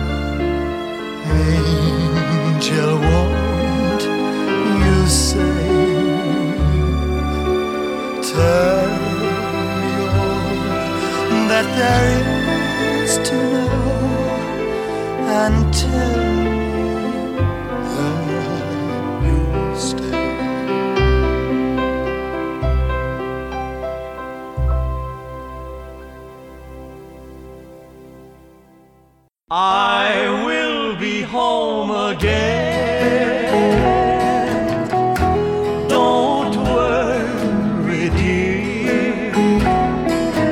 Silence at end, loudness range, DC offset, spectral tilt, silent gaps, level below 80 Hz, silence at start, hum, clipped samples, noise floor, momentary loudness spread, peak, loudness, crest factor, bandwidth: 0 s; 7 LU; under 0.1%; -5.5 dB/octave; none; -26 dBFS; 0 s; none; under 0.1%; -55 dBFS; 10 LU; -2 dBFS; -18 LUFS; 16 dB; 16 kHz